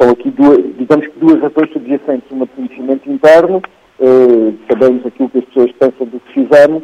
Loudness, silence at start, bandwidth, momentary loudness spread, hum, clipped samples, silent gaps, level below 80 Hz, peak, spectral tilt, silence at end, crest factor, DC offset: -11 LUFS; 0 s; 9.6 kHz; 12 LU; none; 0.7%; none; -52 dBFS; 0 dBFS; -7 dB/octave; 0 s; 10 dB; under 0.1%